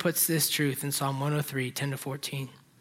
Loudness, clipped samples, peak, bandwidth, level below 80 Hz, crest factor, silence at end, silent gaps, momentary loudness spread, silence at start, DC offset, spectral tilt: -29 LUFS; under 0.1%; -12 dBFS; 16.5 kHz; -72 dBFS; 18 dB; 0.25 s; none; 11 LU; 0 s; under 0.1%; -4 dB/octave